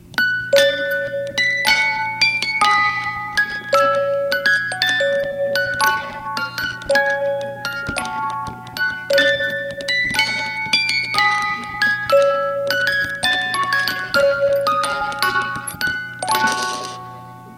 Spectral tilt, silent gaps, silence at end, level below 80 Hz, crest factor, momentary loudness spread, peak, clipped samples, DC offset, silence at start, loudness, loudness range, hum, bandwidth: -2 dB/octave; none; 0 s; -52 dBFS; 20 dB; 9 LU; 0 dBFS; under 0.1%; under 0.1%; 0.05 s; -18 LUFS; 4 LU; none; 17 kHz